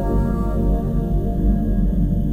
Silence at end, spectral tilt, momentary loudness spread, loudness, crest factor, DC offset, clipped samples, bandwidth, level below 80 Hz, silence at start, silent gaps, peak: 0 s; -10.5 dB/octave; 2 LU; -21 LUFS; 12 dB; under 0.1%; under 0.1%; 15 kHz; -20 dBFS; 0 s; none; -6 dBFS